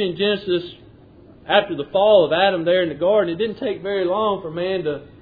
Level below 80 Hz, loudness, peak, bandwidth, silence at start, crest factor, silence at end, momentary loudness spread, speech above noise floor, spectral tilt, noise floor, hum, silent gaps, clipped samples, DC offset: -54 dBFS; -19 LUFS; -2 dBFS; 5 kHz; 0 s; 18 dB; 0.15 s; 10 LU; 27 dB; -8.5 dB/octave; -46 dBFS; none; none; under 0.1%; under 0.1%